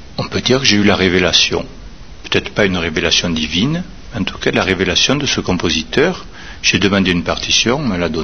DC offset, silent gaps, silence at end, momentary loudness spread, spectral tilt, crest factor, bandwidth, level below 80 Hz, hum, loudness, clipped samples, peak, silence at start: 2%; none; 0 s; 11 LU; -3.5 dB/octave; 16 dB; 7.4 kHz; -36 dBFS; none; -14 LUFS; under 0.1%; 0 dBFS; 0 s